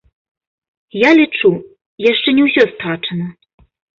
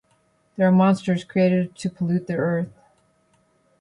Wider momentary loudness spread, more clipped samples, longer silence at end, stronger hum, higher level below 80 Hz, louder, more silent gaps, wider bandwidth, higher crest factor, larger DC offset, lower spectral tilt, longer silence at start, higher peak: first, 14 LU vs 11 LU; neither; second, 0.65 s vs 1.15 s; neither; about the same, -58 dBFS vs -62 dBFS; first, -14 LUFS vs -21 LUFS; first, 1.86-1.98 s vs none; second, 7.2 kHz vs 10.5 kHz; about the same, 14 dB vs 16 dB; neither; second, -6.5 dB/octave vs -8 dB/octave; first, 0.95 s vs 0.6 s; first, -2 dBFS vs -8 dBFS